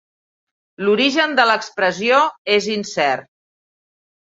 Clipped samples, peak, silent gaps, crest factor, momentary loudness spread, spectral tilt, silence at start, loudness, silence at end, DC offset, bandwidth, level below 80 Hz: under 0.1%; -2 dBFS; 2.38-2.45 s; 18 dB; 6 LU; -3.5 dB/octave; 0.8 s; -17 LUFS; 1.1 s; under 0.1%; 7.8 kHz; -66 dBFS